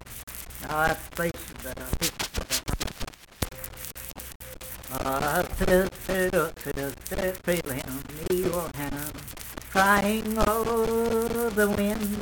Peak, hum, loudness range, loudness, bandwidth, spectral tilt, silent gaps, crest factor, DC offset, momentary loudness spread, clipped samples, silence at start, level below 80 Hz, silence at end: -4 dBFS; none; 7 LU; -27 LUFS; 19 kHz; -4 dB/octave; 0.23-0.27 s, 4.35-4.40 s; 24 dB; under 0.1%; 14 LU; under 0.1%; 0 s; -40 dBFS; 0 s